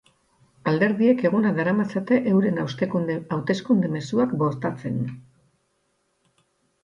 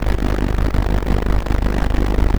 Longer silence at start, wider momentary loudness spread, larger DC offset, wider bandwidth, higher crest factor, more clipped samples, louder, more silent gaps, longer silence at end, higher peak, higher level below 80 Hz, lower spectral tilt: first, 0.65 s vs 0 s; first, 9 LU vs 1 LU; second, under 0.1% vs 3%; second, 7.6 kHz vs 19 kHz; about the same, 16 dB vs 14 dB; neither; second, -23 LUFS vs -20 LUFS; neither; first, 1.65 s vs 0 s; second, -6 dBFS vs -2 dBFS; second, -64 dBFS vs -18 dBFS; about the same, -8 dB/octave vs -7 dB/octave